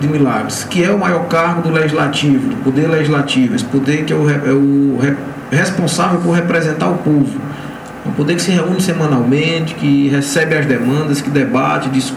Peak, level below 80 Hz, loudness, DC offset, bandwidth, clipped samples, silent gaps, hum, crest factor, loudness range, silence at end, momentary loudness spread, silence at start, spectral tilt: 0 dBFS; -50 dBFS; -14 LUFS; under 0.1%; 19.5 kHz; under 0.1%; none; none; 14 dB; 2 LU; 0 s; 4 LU; 0 s; -6 dB/octave